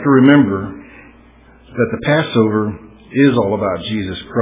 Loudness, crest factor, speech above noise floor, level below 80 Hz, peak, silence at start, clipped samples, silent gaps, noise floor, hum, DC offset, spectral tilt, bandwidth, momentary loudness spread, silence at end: -15 LUFS; 16 dB; 31 dB; -44 dBFS; 0 dBFS; 0 s; under 0.1%; none; -45 dBFS; none; under 0.1%; -11 dB/octave; 3.8 kHz; 17 LU; 0 s